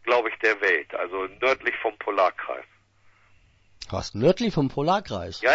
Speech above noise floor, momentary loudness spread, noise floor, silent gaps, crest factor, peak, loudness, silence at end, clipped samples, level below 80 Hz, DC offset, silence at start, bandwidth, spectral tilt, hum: 34 dB; 12 LU; -59 dBFS; none; 18 dB; -6 dBFS; -25 LUFS; 0 s; under 0.1%; -54 dBFS; under 0.1%; 0.05 s; 8 kHz; -5.5 dB/octave; none